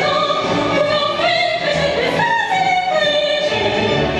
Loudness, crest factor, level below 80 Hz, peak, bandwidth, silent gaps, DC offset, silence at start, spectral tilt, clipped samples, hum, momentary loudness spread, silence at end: -16 LUFS; 12 dB; -44 dBFS; -4 dBFS; 11 kHz; none; under 0.1%; 0 s; -4 dB/octave; under 0.1%; none; 2 LU; 0 s